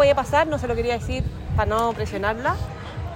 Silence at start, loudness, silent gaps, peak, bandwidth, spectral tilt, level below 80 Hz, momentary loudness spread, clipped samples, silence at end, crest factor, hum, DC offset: 0 s; -24 LUFS; none; -6 dBFS; 16 kHz; -6 dB/octave; -34 dBFS; 8 LU; under 0.1%; 0 s; 16 dB; none; under 0.1%